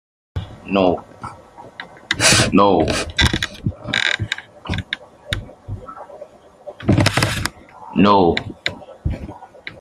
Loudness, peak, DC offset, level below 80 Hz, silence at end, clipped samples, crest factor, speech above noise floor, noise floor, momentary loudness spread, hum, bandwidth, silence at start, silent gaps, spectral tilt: -18 LUFS; 0 dBFS; under 0.1%; -38 dBFS; 0.05 s; under 0.1%; 20 dB; 26 dB; -41 dBFS; 23 LU; none; 15.5 kHz; 0.35 s; none; -4 dB/octave